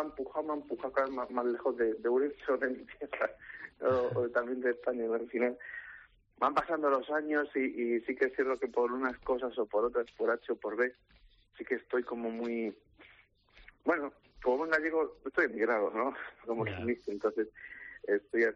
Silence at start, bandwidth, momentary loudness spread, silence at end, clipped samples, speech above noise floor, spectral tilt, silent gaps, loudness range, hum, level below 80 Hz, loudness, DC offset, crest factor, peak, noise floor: 0 s; 7.4 kHz; 8 LU; 0 s; under 0.1%; 31 dB; -4.5 dB/octave; none; 4 LU; none; -66 dBFS; -33 LUFS; under 0.1%; 16 dB; -16 dBFS; -64 dBFS